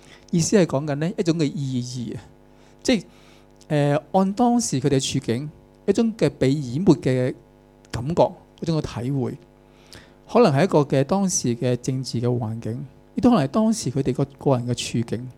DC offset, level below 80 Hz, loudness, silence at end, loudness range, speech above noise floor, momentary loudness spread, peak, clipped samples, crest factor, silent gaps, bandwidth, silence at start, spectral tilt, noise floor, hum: under 0.1%; -52 dBFS; -22 LUFS; 0.05 s; 3 LU; 30 dB; 12 LU; -4 dBFS; under 0.1%; 20 dB; none; 14 kHz; 0.1 s; -6 dB/octave; -51 dBFS; none